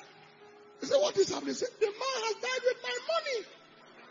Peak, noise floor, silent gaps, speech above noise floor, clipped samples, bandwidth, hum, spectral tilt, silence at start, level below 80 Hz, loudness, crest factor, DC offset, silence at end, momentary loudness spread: -16 dBFS; -55 dBFS; none; 24 dB; under 0.1%; 7.6 kHz; none; -2 dB/octave; 0 s; -82 dBFS; -32 LUFS; 18 dB; under 0.1%; 0 s; 8 LU